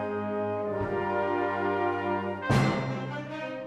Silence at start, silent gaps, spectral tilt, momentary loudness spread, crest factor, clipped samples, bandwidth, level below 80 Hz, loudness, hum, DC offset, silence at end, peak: 0 s; none; -7 dB/octave; 9 LU; 18 dB; under 0.1%; 13 kHz; -54 dBFS; -29 LUFS; none; under 0.1%; 0 s; -12 dBFS